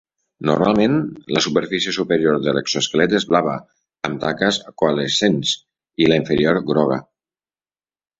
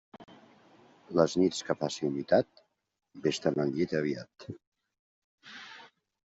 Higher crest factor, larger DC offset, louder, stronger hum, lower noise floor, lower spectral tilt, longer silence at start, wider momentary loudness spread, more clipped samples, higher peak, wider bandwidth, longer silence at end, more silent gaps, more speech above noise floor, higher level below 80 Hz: about the same, 18 dB vs 22 dB; neither; first, -19 LUFS vs -30 LUFS; neither; first, under -90 dBFS vs -60 dBFS; about the same, -4.5 dB/octave vs -5.5 dB/octave; first, 0.4 s vs 0.2 s; second, 9 LU vs 20 LU; neither; first, -2 dBFS vs -10 dBFS; about the same, 8 kHz vs 8 kHz; first, 1.2 s vs 0.5 s; second, none vs 4.67-4.72 s, 4.99-5.38 s; first, over 72 dB vs 30 dB; first, -52 dBFS vs -70 dBFS